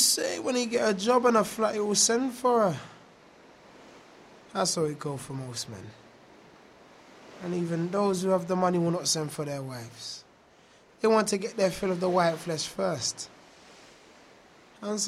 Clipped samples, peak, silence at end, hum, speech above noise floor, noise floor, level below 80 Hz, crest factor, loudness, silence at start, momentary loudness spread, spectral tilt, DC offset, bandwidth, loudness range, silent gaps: under 0.1%; -10 dBFS; 0 s; none; 31 dB; -58 dBFS; -66 dBFS; 20 dB; -27 LUFS; 0 s; 16 LU; -3.5 dB/octave; under 0.1%; 16 kHz; 9 LU; none